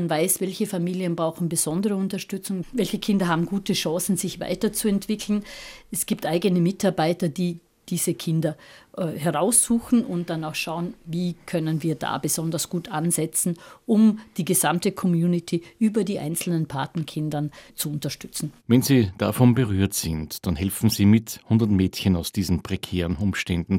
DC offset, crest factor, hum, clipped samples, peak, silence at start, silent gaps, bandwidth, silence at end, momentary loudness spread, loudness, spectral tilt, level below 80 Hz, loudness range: under 0.1%; 18 dB; none; under 0.1%; -4 dBFS; 0 s; none; 17 kHz; 0 s; 11 LU; -24 LUFS; -5 dB/octave; -50 dBFS; 4 LU